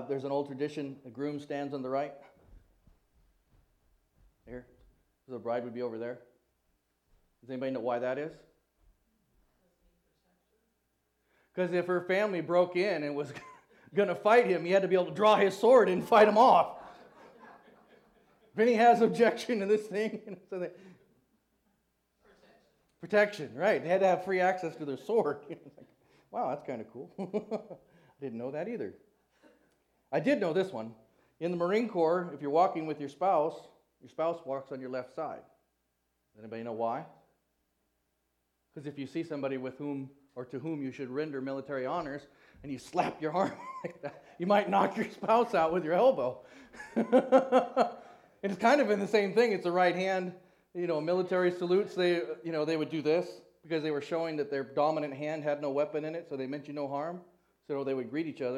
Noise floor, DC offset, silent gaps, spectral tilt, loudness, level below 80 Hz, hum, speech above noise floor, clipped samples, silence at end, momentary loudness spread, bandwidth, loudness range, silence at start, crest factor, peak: -79 dBFS; under 0.1%; none; -6 dB/octave; -30 LUFS; -74 dBFS; none; 49 dB; under 0.1%; 0 s; 18 LU; 14 kHz; 14 LU; 0 s; 22 dB; -10 dBFS